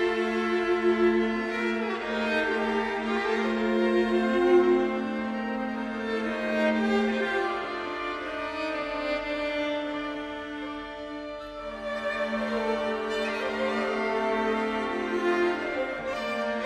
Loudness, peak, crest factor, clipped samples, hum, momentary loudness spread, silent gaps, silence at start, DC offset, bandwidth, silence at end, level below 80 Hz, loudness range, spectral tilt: -28 LUFS; -12 dBFS; 16 dB; under 0.1%; none; 9 LU; none; 0 s; under 0.1%; 10.5 kHz; 0 s; -56 dBFS; 7 LU; -5 dB/octave